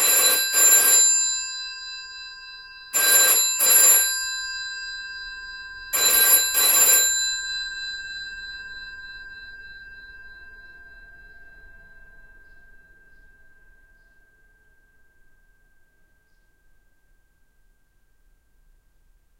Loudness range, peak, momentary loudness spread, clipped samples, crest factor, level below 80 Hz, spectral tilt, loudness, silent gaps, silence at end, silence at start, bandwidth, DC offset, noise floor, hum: 19 LU; -4 dBFS; 25 LU; under 0.1%; 20 dB; -56 dBFS; 3 dB/octave; -16 LUFS; none; 7.95 s; 0 s; 16 kHz; under 0.1%; -61 dBFS; none